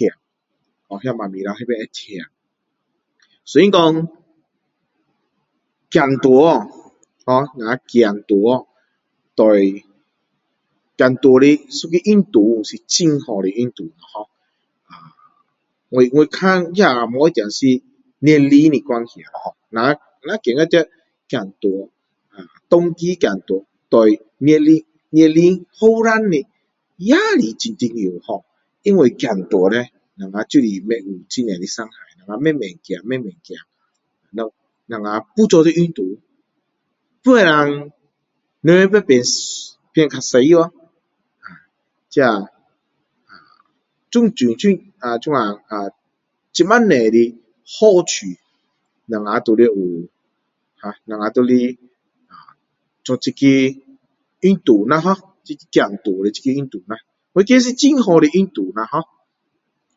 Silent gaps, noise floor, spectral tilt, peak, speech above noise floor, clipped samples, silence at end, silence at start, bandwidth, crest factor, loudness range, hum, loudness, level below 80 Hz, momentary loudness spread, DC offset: none; -74 dBFS; -5.5 dB/octave; 0 dBFS; 59 dB; under 0.1%; 0.95 s; 0 s; 7.8 kHz; 16 dB; 6 LU; none; -15 LUFS; -64 dBFS; 17 LU; under 0.1%